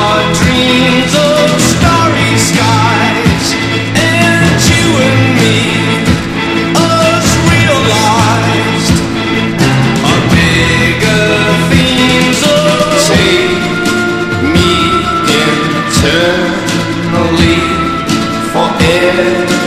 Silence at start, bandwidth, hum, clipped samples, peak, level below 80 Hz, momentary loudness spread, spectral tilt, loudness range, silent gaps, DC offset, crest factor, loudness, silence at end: 0 s; 14.5 kHz; none; 0.5%; 0 dBFS; -28 dBFS; 5 LU; -4.5 dB/octave; 2 LU; none; under 0.1%; 10 dB; -9 LUFS; 0 s